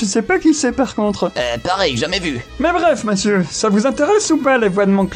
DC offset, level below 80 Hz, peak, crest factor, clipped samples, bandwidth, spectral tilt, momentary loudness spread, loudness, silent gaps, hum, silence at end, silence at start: under 0.1%; -40 dBFS; -2 dBFS; 14 dB; under 0.1%; 11 kHz; -4.5 dB/octave; 5 LU; -16 LUFS; none; none; 0 s; 0 s